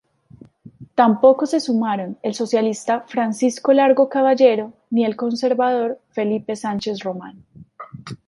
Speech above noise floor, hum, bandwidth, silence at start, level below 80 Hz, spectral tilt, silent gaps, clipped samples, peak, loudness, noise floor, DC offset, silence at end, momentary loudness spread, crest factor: 29 dB; none; 11.5 kHz; 0.65 s; -64 dBFS; -5.5 dB/octave; none; under 0.1%; 0 dBFS; -19 LUFS; -47 dBFS; under 0.1%; 0.15 s; 11 LU; 18 dB